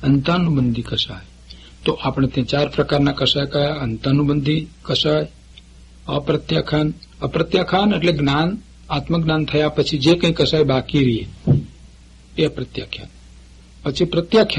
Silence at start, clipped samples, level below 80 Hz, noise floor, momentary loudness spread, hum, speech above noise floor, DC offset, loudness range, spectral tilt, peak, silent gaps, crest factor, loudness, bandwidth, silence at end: 0 s; under 0.1%; -40 dBFS; -44 dBFS; 11 LU; none; 26 dB; under 0.1%; 4 LU; -6.5 dB/octave; -4 dBFS; none; 16 dB; -19 LUFS; 10.5 kHz; 0 s